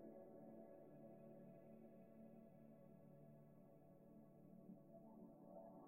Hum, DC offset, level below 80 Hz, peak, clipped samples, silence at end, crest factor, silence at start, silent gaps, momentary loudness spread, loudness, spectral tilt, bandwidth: none; under 0.1%; -88 dBFS; -48 dBFS; under 0.1%; 0 s; 14 dB; 0 s; none; 5 LU; -65 LUFS; -8 dB/octave; 2.8 kHz